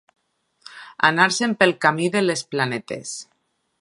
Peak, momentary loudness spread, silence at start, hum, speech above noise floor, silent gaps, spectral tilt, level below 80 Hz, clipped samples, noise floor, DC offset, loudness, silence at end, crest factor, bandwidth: 0 dBFS; 17 LU; 0.7 s; none; 50 dB; none; -3.5 dB/octave; -70 dBFS; under 0.1%; -70 dBFS; under 0.1%; -20 LUFS; 0.6 s; 22 dB; 11.5 kHz